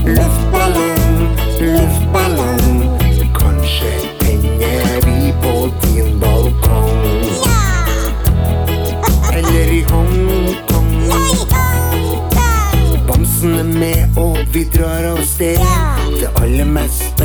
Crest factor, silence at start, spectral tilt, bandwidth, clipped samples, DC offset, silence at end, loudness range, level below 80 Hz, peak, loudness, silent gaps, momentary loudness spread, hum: 12 dB; 0 s; -5.5 dB/octave; over 20 kHz; under 0.1%; under 0.1%; 0 s; 1 LU; -14 dBFS; 0 dBFS; -14 LUFS; none; 3 LU; none